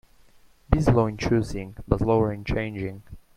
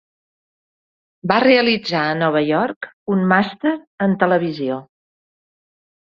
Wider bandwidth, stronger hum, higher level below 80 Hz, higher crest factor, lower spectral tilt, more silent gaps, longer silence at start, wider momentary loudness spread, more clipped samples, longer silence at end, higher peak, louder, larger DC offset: first, 12 kHz vs 7 kHz; neither; first, -36 dBFS vs -62 dBFS; about the same, 22 dB vs 18 dB; about the same, -7.5 dB/octave vs -7 dB/octave; second, none vs 2.76-2.81 s, 2.93-3.06 s, 3.87-3.98 s; second, 0.7 s vs 1.25 s; about the same, 13 LU vs 11 LU; neither; second, 0.2 s vs 1.3 s; about the same, -2 dBFS vs 0 dBFS; second, -25 LUFS vs -18 LUFS; neither